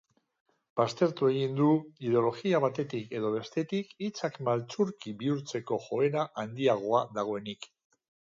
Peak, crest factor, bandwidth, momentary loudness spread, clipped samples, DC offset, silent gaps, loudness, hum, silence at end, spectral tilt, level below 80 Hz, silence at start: -12 dBFS; 18 dB; 7.8 kHz; 8 LU; under 0.1%; under 0.1%; none; -30 LUFS; none; 0.65 s; -6.5 dB/octave; -76 dBFS; 0.75 s